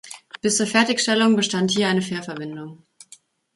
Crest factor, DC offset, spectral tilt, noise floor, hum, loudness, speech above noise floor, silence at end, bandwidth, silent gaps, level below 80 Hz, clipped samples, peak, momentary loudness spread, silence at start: 18 dB; under 0.1%; -3.5 dB/octave; -52 dBFS; none; -20 LUFS; 31 dB; 0.8 s; 11.5 kHz; none; -66 dBFS; under 0.1%; -4 dBFS; 17 LU; 0.05 s